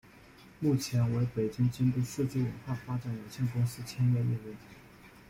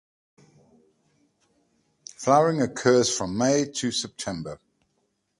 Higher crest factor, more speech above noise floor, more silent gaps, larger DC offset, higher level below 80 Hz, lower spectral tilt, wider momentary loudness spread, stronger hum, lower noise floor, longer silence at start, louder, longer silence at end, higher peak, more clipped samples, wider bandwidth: second, 14 dB vs 22 dB; second, 24 dB vs 50 dB; neither; neither; about the same, -60 dBFS vs -60 dBFS; first, -7 dB/octave vs -4 dB/octave; second, 9 LU vs 20 LU; neither; second, -55 dBFS vs -73 dBFS; second, 0.4 s vs 2.2 s; second, -32 LUFS vs -24 LUFS; second, 0.2 s vs 0.85 s; second, -18 dBFS vs -4 dBFS; neither; first, 16 kHz vs 11.5 kHz